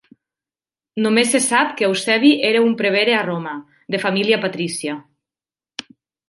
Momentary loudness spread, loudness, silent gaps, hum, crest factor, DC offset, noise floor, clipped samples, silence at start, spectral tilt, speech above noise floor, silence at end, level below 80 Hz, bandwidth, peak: 19 LU; -17 LUFS; none; none; 18 dB; under 0.1%; under -90 dBFS; under 0.1%; 0.95 s; -3.5 dB/octave; over 73 dB; 0.5 s; -70 dBFS; 11.5 kHz; -2 dBFS